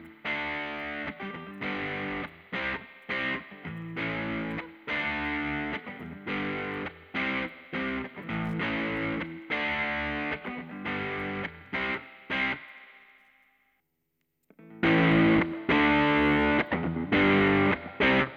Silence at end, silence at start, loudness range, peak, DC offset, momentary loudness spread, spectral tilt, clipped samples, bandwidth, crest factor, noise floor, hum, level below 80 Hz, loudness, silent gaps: 0 s; 0 s; 10 LU; -12 dBFS; under 0.1%; 14 LU; -7.5 dB/octave; under 0.1%; 6.6 kHz; 18 dB; -79 dBFS; none; -52 dBFS; -29 LUFS; none